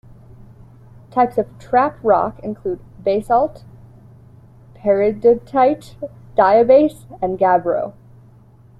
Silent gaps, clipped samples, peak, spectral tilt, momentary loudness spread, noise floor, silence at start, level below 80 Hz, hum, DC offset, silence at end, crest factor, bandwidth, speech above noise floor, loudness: none; under 0.1%; -2 dBFS; -7.5 dB/octave; 13 LU; -46 dBFS; 1.15 s; -48 dBFS; none; under 0.1%; 0.9 s; 16 dB; 12 kHz; 30 dB; -17 LUFS